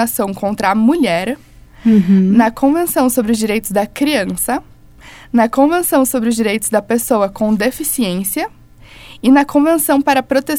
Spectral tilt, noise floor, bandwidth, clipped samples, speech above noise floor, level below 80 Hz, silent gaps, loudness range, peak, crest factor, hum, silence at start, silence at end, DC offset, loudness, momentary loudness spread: -5 dB/octave; -39 dBFS; 18 kHz; under 0.1%; 25 dB; -44 dBFS; none; 2 LU; 0 dBFS; 14 dB; none; 0 s; 0 s; under 0.1%; -14 LUFS; 8 LU